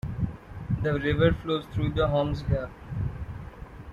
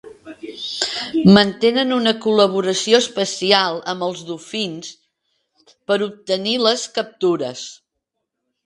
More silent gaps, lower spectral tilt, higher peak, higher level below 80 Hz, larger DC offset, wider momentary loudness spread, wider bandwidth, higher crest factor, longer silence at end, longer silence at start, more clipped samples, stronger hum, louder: neither; first, -8.5 dB/octave vs -4.5 dB/octave; second, -8 dBFS vs 0 dBFS; first, -40 dBFS vs -58 dBFS; neither; about the same, 17 LU vs 16 LU; second, 7.4 kHz vs 11.5 kHz; about the same, 20 dB vs 20 dB; second, 0 s vs 0.9 s; about the same, 0.05 s vs 0.05 s; neither; neither; second, -28 LUFS vs -18 LUFS